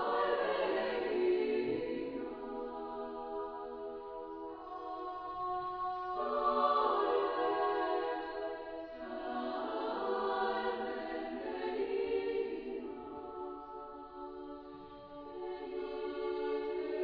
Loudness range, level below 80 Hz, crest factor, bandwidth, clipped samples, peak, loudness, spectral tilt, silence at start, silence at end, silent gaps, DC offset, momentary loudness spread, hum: 9 LU; -66 dBFS; 18 dB; 5.4 kHz; under 0.1%; -20 dBFS; -37 LUFS; -2 dB/octave; 0 s; 0 s; none; under 0.1%; 13 LU; none